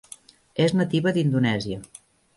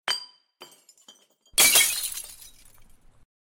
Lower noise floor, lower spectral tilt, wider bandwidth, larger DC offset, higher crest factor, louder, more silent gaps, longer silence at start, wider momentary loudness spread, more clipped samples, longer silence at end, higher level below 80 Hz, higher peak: second, -48 dBFS vs -57 dBFS; first, -6.5 dB/octave vs 2.5 dB/octave; second, 11.5 kHz vs 17 kHz; neither; second, 16 dB vs 22 dB; second, -23 LUFS vs -20 LUFS; neither; first, 0.55 s vs 0.05 s; about the same, 17 LU vs 19 LU; neither; second, 0.5 s vs 1.15 s; about the same, -58 dBFS vs -58 dBFS; about the same, -8 dBFS vs -6 dBFS